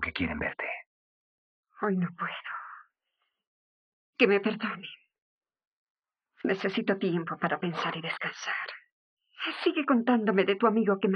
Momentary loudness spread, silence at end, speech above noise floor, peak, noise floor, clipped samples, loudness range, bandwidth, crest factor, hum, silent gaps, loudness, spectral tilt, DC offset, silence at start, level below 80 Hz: 15 LU; 0 s; 53 dB; -8 dBFS; -81 dBFS; under 0.1%; 7 LU; 6.4 kHz; 22 dB; none; 0.87-1.63 s, 3.47-4.13 s, 5.22-5.41 s, 5.67-5.95 s, 8.92-9.17 s; -29 LUFS; -6.5 dB/octave; under 0.1%; 0 s; -62 dBFS